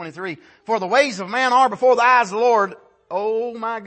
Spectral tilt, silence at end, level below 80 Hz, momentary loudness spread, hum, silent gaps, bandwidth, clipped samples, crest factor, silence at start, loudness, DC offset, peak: -3.5 dB/octave; 0 s; -72 dBFS; 14 LU; none; none; 8.8 kHz; under 0.1%; 16 dB; 0 s; -18 LUFS; under 0.1%; -4 dBFS